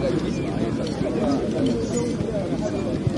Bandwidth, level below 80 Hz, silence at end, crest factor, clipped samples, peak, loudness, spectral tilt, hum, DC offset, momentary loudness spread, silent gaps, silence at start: 11.5 kHz; -42 dBFS; 0 s; 14 dB; under 0.1%; -10 dBFS; -24 LUFS; -6.5 dB/octave; none; under 0.1%; 3 LU; none; 0 s